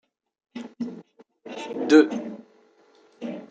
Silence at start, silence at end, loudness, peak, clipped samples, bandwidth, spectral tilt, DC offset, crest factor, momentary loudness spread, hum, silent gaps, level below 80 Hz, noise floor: 0.55 s; 0.05 s; -22 LUFS; -4 dBFS; under 0.1%; 7.8 kHz; -5 dB/octave; under 0.1%; 24 dB; 25 LU; none; none; -78 dBFS; -58 dBFS